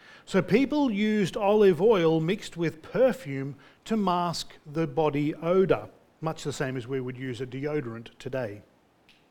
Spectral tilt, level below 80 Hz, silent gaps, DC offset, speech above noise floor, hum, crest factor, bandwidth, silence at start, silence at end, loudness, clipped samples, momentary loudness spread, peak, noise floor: -6.5 dB/octave; -56 dBFS; none; under 0.1%; 35 dB; none; 18 dB; 17 kHz; 0.1 s; 0.7 s; -27 LUFS; under 0.1%; 14 LU; -8 dBFS; -61 dBFS